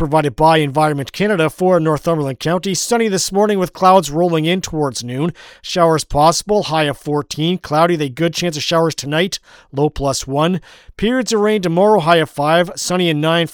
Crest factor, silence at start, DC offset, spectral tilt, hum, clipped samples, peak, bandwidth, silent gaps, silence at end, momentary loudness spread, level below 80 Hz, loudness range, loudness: 16 dB; 0 s; under 0.1%; -4.5 dB/octave; none; under 0.1%; 0 dBFS; 19 kHz; none; 0.05 s; 8 LU; -40 dBFS; 2 LU; -16 LUFS